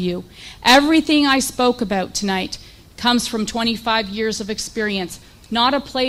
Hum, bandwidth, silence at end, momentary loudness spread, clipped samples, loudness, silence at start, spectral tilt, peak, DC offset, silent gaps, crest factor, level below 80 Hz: none; 16 kHz; 0 s; 14 LU; under 0.1%; -18 LUFS; 0 s; -3 dB/octave; 0 dBFS; under 0.1%; none; 18 dB; -46 dBFS